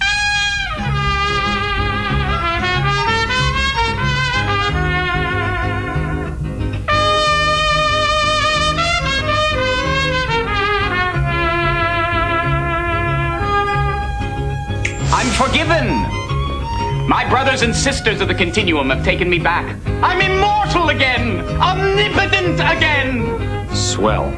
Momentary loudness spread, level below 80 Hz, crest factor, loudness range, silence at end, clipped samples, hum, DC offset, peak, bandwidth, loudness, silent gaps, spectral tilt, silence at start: 7 LU; -26 dBFS; 16 dB; 3 LU; 0 s; under 0.1%; none; 0.4%; 0 dBFS; 11 kHz; -16 LUFS; none; -4.5 dB/octave; 0 s